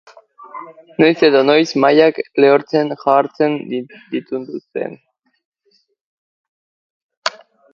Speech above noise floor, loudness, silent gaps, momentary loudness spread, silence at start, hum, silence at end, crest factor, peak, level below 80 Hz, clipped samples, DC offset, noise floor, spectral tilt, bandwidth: 46 dB; -15 LUFS; 5.45-5.52 s, 6.01-7.09 s, 7.17-7.22 s; 17 LU; 0.55 s; none; 0.45 s; 18 dB; 0 dBFS; -64 dBFS; under 0.1%; under 0.1%; -61 dBFS; -5.5 dB/octave; 7.4 kHz